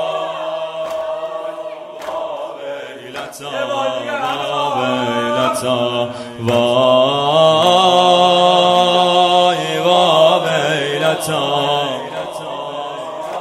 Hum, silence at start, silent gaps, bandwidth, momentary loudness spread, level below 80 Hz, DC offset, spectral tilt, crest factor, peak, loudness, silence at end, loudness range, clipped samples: none; 0 s; none; 15 kHz; 15 LU; -60 dBFS; under 0.1%; -4 dB/octave; 16 dB; 0 dBFS; -15 LUFS; 0 s; 12 LU; under 0.1%